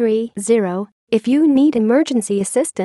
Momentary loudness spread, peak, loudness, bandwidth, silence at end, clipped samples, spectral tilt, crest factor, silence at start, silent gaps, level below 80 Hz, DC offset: 7 LU; -4 dBFS; -17 LUFS; 12.5 kHz; 0 s; under 0.1%; -5.5 dB/octave; 12 dB; 0 s; 0.92-1.07 s; -64 dBFS; under 0.1%